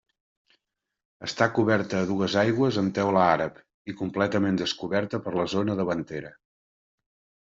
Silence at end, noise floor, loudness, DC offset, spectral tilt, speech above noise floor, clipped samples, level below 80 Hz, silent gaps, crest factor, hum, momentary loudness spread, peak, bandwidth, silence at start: 1.15 s; -81 dBFS; -25 LUFS; under 0.1%; -6 dB/octave; 56 dB; under 0.1%; -64 dBFS; 3.74-3.85 s; 20 dB; none; 14 LU; -6 dBFS; 7.8 kHz; 1.2 s